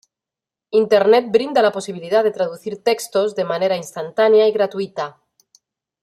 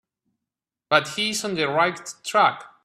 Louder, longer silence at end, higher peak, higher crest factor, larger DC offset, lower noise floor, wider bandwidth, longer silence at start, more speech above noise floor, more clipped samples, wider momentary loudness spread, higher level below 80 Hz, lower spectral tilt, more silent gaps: first, -18 LUFS vs -22 LUFS; first, 0.9 s vs 0.2 s; about the same, -2 dBFS vs 0 dBFS; second, 16 dB vs 24 dB; neither; about the same, -88 dBFS vs -87 dBFS; about the same, 14 kHz vs 15 kHz; second, 0.7 s vs 0.9 s; first, 71 dB vs 65 dB; neither; first, 12 LU vs 4 LU; about the same, -70 dBFS vs -70 dBFS; first, -4.5 dB/octave vs -3 dB/octave; neither